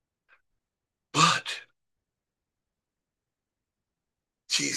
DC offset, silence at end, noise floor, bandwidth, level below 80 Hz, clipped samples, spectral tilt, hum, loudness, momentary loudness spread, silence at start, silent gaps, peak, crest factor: under 0.1%; 0 s; -88 dBFS; 12.5 kHz; -78 dBFS; under 0.1%; -2 dB/octave; none; -25 LUFS; 14 LU; 1.15 s; none; -8 dBFS; 26 dB